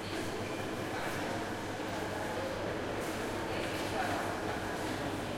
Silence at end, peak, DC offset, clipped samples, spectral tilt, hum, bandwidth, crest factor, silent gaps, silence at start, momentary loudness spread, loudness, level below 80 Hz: 0 s; -22 dBFS; under 0.1%; under 0.1%; -4.5 dB/octave; none; 16.5 kHz; 14 dB; none; 0 s; 3 LU; -36 LUFS; -56 dBFS